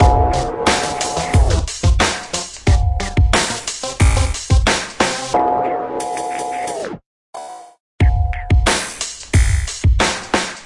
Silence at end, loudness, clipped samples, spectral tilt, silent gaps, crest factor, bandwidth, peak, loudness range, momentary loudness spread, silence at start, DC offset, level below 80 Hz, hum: 0 s; -17 LUFS; under 0.1%; -4 dB/octave; 7.06-7.33 s, 7.80-7.99 s; 16 dB; 11.5 kHz; 0 dBFS; 4 LU; 9 LU; 0 s; under 0.1%; -20 dBFS; none